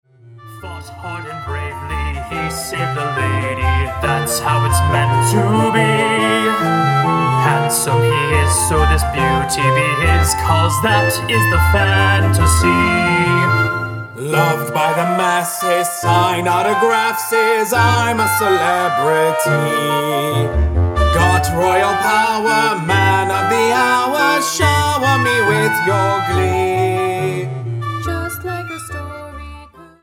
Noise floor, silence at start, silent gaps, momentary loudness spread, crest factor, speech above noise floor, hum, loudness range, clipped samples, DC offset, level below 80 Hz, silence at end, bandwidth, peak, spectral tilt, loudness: -39 dBFS; 0.25 s; none; 10 LU; 14 dB; 24 dB; none; 5 LU; under 0.1%; under 0.1%; -28 dBFS; 0.15 s; 18 kHz; 0 dBFS; -4.5 dB/octave; -15 LUFS